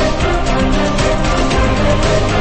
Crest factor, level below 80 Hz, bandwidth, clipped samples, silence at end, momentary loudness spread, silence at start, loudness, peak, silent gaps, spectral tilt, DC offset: 12 dB; -18 dBFS; 8.8 kHz; under 0.1%; 0 s; 1 LU; 0 s; -15 LUFS; 0 dBFS; none; -5.5 dB/octave; under 0.1%